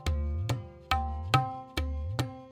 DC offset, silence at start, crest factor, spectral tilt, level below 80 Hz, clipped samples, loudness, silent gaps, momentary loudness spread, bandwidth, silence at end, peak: under 0.1%; 0 s; 22 dB; -5.5 dB/octave; -38 dBFS; under 0.1%; -32 LUFS; none; 7 LU; 16 kHz; 0 s; -8 dBFS